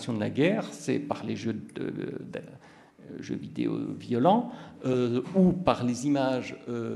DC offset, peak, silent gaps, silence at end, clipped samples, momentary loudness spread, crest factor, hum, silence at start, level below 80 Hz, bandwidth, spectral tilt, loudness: under 0.1%; -8 dBFS; none; 0 s; under 0.1%; 15 LU; 22 dB; none; 0 s; -60 dBFS; 12 kHz; -7 dB/octave; -29 LUFS